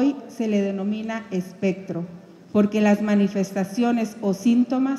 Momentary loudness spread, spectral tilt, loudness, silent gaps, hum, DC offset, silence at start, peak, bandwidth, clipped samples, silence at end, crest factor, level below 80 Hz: 10 LU; -7 dB/octave; -23 LUFS; none; none; under 0.1%; 0 s; -6 dBFS; 12.5 kHz; under 0.1%; 0 s; 16 dB; -68 dBFS